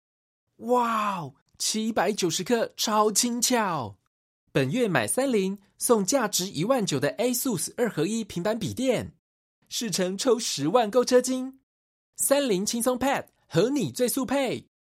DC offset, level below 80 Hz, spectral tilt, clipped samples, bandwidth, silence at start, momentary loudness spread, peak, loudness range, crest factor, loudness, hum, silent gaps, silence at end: under 0.1%; -64 dBFS; -3.5 dB/octave; under 0.1%; 16 kHz; 0.6 s; 8 LU; -8 dBFS; 2 LU; 20 dB; -25 LUFS; none; 1.42-1.46 s, 4.07-4.47 s, 9.19-9.62 s, 11.63-12.13 s; 0.35 s